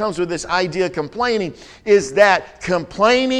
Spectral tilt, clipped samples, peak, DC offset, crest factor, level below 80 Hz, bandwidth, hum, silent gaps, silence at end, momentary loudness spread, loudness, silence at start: -4 dB/octave; under 0.1%; 0 dBFS; under 0.1%; 16 dB; -48 dBFS; 10.5 kHz; none; none; 0 s; 9 LU; -18 LUFS; 0 s